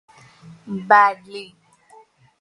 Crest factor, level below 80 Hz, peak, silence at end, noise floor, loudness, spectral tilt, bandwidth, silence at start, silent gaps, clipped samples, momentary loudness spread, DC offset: 22 dB; -70 dBFS; 0 dBFS; 0.95 s; -51 dBFS; -15 LUFS; -5.5 dB/octave; 11 kHz; 0.65 s; none; under 0.1%; 22 LU; under 0.1%